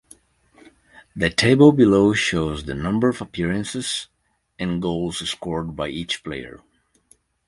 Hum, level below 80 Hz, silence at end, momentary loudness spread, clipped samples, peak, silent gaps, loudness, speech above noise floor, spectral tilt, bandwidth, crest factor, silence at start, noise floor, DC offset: none; -44 dBFS; 0.9 s; 15 LU; under 0.1%; 0 dBFS; none; -20 LUFS; 39 dB; -5.5 dB/octave; 11.5 kHz; 22 dB; 1.15 s; -59 dBFS; under 0.1%